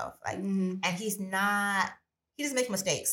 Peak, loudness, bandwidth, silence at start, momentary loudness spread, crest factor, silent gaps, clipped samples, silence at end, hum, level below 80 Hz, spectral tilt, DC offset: -12 dBFS; -30 LUFS; 17 kHz; 0 s; 8 LU; 20 dB; none; under 0.1%; 0 s; none; -70 dBFS; -3.5 dB/octave; under 0.1%